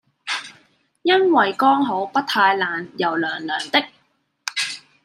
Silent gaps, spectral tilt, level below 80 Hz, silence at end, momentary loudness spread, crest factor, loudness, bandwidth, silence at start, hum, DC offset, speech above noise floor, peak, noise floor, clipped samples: none; -3 dB/octave; -74 dBFS; 0.25 s; 11 LU; 20 dB; -20 LUFS; 14 kHz; 0.25 s; none; under 0.1%; 46 dB; -2 dBFS; -65 dBFS; under 0.1%